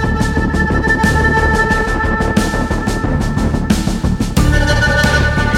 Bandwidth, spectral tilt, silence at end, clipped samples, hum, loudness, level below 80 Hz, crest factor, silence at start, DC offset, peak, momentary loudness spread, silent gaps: 16.5 kHz; -5.5 dB/octave; 0 s; under 0.1%; none; -14 LUFS; -20 dBFS; 14 dB; 0 s; under 0.1%; 0 dBFS; 5 LU; none